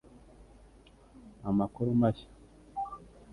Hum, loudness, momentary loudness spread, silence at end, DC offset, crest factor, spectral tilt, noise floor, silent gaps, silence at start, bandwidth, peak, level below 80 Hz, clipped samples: none; -32 LUFS; 16 LU; 0 s; under 0.1%; 20 dB; -9.5 dB/octave; -58 dBFS; none; 0.4 s; 10.5 kHz; -14 dBFS; -58 dBFS; under 0.1%